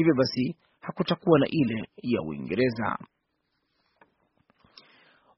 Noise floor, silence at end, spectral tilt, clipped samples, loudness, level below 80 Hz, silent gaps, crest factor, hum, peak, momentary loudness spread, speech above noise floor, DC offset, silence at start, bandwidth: -77 dBFS; 2.35 s; -5.5 dB/octave; under 0.1%; -27 LUFS; -62 dBFS; none; 22 dB; none; -6 dBFS; 11 LU; 51 dB; under 0.1%; 0 s; 6 kHz